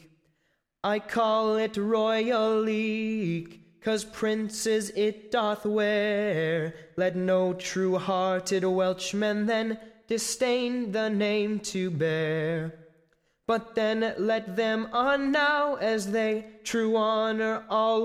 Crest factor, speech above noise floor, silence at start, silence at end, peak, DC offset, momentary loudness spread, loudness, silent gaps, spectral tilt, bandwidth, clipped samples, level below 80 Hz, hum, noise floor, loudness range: 14 dB; 48 dB; 0.85 s; 0 s; -14 dBFS; under 0.1%; 6 LU; -27 LUFS; none; -4.5 dB/octave; 15 kHz; under 0.1%; -66 dBFS; none; -74 dBFS; 3 LU